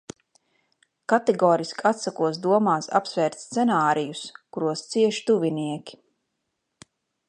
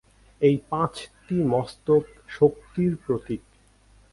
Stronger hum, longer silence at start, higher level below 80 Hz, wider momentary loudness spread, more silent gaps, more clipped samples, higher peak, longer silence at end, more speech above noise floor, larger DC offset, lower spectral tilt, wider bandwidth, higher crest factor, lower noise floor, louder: neither; first, 1.1 s vs 0.4 s; second, -76 dBFS vs -54 dBFS; about the same, 12 LU vs 11 LU; neither; neither; about the same, -4 dBFS vs -6 dBFS; first, 1.35 s vs 0.75 s; first, 55 dB vs 33 dB; neither; second, -5 dB/octave vs -8 dB/octave; about the same, 11 kHz vs 11.5 kHz; about the same, 20 dB vs 20 dB; first, -78 dBFS vs -57 dBFS; about the same, -23 LUFS vs -25 LUFS